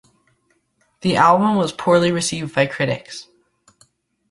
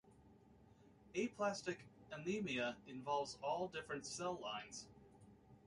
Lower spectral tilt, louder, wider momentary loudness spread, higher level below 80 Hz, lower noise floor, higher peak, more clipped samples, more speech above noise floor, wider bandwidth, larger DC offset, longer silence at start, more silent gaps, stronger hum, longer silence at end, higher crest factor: about the same, -5 dB/octave vs -4 dB/octave; first, -18 LUFS vs -45 LUFS; about the same, 13 LU vs 13 LU; first, -56 dBFS vs -76 dBFS; about the same, -65 dBFS vs -67 dBFS; first, -2 dBFS vs -28 dBFS; neither; first, 47 dB vs 23 dB; about the same, 11.5 kHz vs 11.5 kHz; neither; first, 1.05 s vs 0.05 s; neither; neither; first, 1.1 s vs 0 s; about the same, 18 dB vs 20 dB